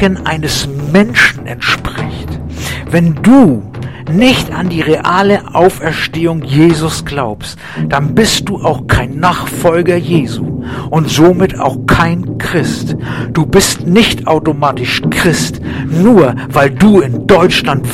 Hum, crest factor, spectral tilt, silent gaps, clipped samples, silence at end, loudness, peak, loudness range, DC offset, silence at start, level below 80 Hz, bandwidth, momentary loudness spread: none; 10 dB; -5.5 dB/octave; none; 1%; 0 s; -11 LUFS; 0 dBFS; 3 LU; 0.8%; 0 s; -30 dBFS; 16 kHz; 11 LU